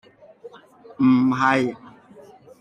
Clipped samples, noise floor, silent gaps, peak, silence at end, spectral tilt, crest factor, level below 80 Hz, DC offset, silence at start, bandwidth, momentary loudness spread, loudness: under 0.1%; -48 dBFS; none; -6 dBFS; 0.7 s; -7 dB/octave; 18 dB; -64 dBFS; under 0.1%; 0.45 s; 8.6 kHz; 11 LU; -19 LUFS